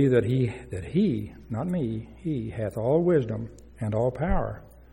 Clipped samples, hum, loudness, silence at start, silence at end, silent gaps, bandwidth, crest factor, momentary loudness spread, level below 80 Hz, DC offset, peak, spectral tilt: under 0.1%; none; -27 LUFS; 0 s; 0.1 s; none; 15.5 kHz; 16 dB; 13 LU; -40 dBFS; under 0.1%; -10 dBFS; -9 dB/octave